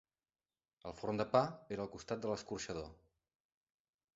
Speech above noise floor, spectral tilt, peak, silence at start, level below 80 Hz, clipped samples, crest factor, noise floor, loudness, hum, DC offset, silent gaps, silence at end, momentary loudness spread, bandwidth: over 51 dB; -5 dB/octave; -16 dBFS; 0.85 s; -68 dBFS; under 0.1%; 26 dB; under -90 dBFS; -40 LUFS; none; under 0.1%; none; 1.25 s; 16 LU; 7.6 kHz